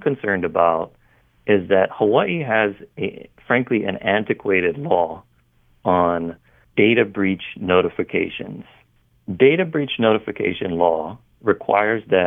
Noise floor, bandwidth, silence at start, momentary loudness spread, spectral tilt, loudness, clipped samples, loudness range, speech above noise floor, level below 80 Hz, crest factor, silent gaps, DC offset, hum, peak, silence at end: -58 dBFS; 3.8 kHz; 0 s; 12 LU; -9 dB/octave; -20 LUFS; under 0.1%; 2 LU; 39 dB; -58 dBFS; 18 dB; none; under 0.1%; none; -2 dBFS; 0 s